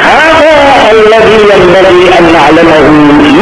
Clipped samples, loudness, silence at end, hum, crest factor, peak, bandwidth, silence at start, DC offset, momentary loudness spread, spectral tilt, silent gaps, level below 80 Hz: 30%; -2 LUFS; 0 s; none; 2 dB; 0 dBFS; 11 kHz; 0 s; 1%; 0 LU; -5 dB/octave; none; -26 dBFS